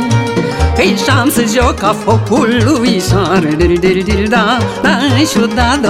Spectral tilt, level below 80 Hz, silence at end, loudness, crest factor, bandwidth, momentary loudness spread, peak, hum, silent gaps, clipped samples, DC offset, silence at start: -5 dB/octave; -26 dBFS; 0 s; -11 LUFS; 10 dB; 16.5 kHz; 3 LU; 0 dBFS; none; none; under 0.1%; under 0.1%; 0 s